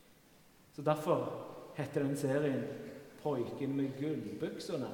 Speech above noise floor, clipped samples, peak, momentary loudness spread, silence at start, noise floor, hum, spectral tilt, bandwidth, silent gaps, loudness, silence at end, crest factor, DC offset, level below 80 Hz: 27 dB; under 0.1%; -16 dBFS; 13 LU; 0.1 s; -63 dBFS; none; -7 dB/octave; 18 kHz; none; -37 LUFS; 0 s; 20 dB; under 0.1%; -76 dBFS